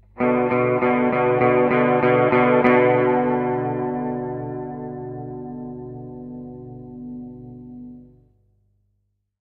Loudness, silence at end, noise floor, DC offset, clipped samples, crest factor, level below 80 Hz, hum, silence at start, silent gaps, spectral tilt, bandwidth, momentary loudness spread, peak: -19 LUFS; 1.4 s; -71 dBFS; under 0.1%; under 0.1%; 18 dB; -54 dBFS; 50 Hz at -55 dBFS; 0.15 s; none; -10 dB/octave; 4.6 kHz; 22 LU; -4 dBFS